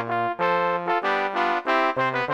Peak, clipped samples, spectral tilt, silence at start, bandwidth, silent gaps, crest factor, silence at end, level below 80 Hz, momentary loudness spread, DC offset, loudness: -8 dBFS; under 0.1%; -5.5 dB/octave; 0 s; 13 kHz; none; 16 dB; 0 s; -72 dBFS; 2 LU; 0.1%; -23 LUFS